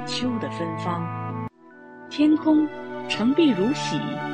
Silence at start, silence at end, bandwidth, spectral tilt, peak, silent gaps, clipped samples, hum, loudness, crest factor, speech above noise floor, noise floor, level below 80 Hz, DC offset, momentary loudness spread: 0 s; 0 s; 9.2 kHz; -6 dB/octave; -8 dBFS; none; under 0.1%; none; -24 LUFS; 14 dB; 24 dB; -46 dBFS; -60 dBFS; under 0.1%; 14 LU